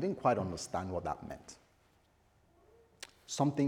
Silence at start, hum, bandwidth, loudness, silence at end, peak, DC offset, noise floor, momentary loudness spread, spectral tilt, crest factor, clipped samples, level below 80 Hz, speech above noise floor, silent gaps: 0 s; none; 17 kHz; -36 LUFS; 0 s; -16 dBFS; under 0.1%; -69 dBFS; 20 LU; -5.5 dB/octave; 22 dB; under 0.1%; -66 dBFS; 35 dB; none